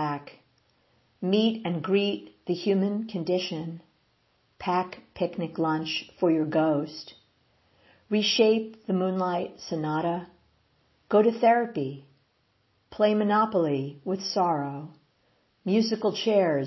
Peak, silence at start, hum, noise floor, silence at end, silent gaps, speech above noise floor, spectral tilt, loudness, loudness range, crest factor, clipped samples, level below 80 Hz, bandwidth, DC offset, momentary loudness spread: -10 dBFS; 0 s; none; -70 dBFS; 0 s; none; 44 dB; -6 dB/octave; -27 LUFS; 4 LU; 18 dB; under 0.1%; -70 dBFS; 6.2 kHz; under 0.1%; 13 LU